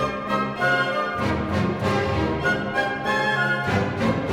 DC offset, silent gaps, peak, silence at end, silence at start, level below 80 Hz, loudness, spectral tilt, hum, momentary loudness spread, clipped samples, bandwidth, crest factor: under 0.1%; none; -8 dBFS; 0 s; 0 s; -42 dBFS; -23 LUFS; -6 dB/octave; none; 3 LU; under 0.1%; 16.5 kHz; 14 dB